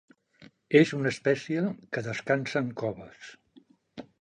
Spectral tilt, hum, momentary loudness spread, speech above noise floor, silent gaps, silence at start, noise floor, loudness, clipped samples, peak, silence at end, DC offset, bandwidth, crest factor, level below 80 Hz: -6 dB/octave; none; 25 LU; 32 dB; none; 0.4 s; -60 dBFS; -28 LUFS; under 0.1%; -8 dBFS; 0.2 s; under 0.1%; 9.8 kHz; 22 dB; -70 dBFS